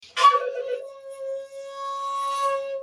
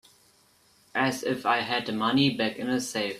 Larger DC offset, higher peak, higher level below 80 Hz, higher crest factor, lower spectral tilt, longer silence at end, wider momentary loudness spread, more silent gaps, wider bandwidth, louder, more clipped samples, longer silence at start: neither; first, -4 dBFS vs -10 dBFS; second, -82 dBFS vs -68 dBFS; about the same, 22 dB vs 20 dB; second, 1 dB/octave vs -4 dB/octave; about the same, 0 s vs 0 s; first, 17 LU vs 6 LU; neither; second, 13 kHz vs 14.5 kHz; about the same, -25 LUFS vs -27 LUFS; neither; second, 0 s vs 0.95 s